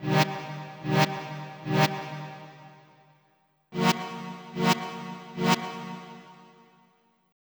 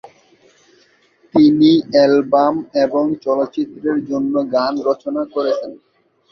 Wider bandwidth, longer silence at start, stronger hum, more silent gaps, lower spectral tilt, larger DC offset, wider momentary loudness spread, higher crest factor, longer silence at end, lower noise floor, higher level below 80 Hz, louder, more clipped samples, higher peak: first, over 20 kHz vs 6.2 kHz; second, 0 s vs 1.35 s; neither; neither; second, -5 dB/octave vs -7 dB/octave; neither; first, 17 LU vs 9 LU; first, 22 dB vs 16 dB; first, 1 s vs 0.55 s; first, -68 dBFS vs -55 dBFS; second, -68 dBFS vs -60 dBFS; second, -29 LUFS vs -16 LUFS; neither; second, -8 dBFS vs 0 dBFS